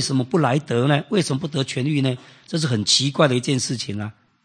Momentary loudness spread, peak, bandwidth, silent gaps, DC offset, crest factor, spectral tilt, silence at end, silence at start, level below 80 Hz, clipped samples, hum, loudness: 11 LU; -2 dBFS; 9.8 kHz; none; under 0.1%; 18 dB; -4.5 dB/octave; 0.35 s; 0 s; -64 dBFS; under 0.1%; none; -21 LUFS